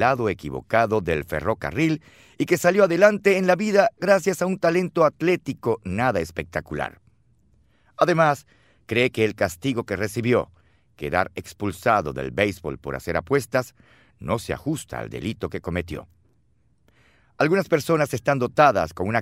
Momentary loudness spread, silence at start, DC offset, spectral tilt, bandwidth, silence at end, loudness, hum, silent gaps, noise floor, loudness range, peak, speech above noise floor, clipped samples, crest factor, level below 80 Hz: 12 LU; 0 s; under 0.1%; -6 dB/octave; 16 kHz; 0 s; -23 LUFS; none; none; -64 dBFS; 8 LU; -2 dBFS; 42 dB; under 0.1%; 20 dB; -50 dBFS